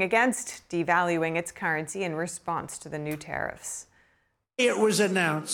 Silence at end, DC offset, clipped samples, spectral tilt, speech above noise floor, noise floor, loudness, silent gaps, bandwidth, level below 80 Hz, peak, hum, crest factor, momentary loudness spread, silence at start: 0 s; under 0.1%; under 0.1%; -4 dB/octave; 43 dB; -70 dBFS; -27 LUFS; none; 18.5 kHz; -64 dBFS; -10 dBFS; none; 18 dB; 12 LU; 0 s